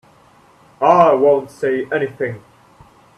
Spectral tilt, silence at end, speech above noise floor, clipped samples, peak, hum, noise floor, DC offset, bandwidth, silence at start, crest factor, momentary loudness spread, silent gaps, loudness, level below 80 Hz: -7 dB/octave; 0.8 s; 35 dB; under 0.1%; 0 dBFS; none; -50 dBFS; under 0.1%; 11.5 kHz; 0.8 s; 18 dB; 14 LU; none; -16 LUFS; -60 dBFS